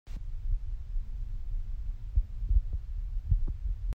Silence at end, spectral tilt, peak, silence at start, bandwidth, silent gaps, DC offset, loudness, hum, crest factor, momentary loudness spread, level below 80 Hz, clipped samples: 0 s; -8.5 dB/octave; -14 dBFS; 0.05 s; 1.6 kHz; none; under 0.1%; -37 LUFS; none; 16 dB; 9 LU; -32 dBFS; under 0.1%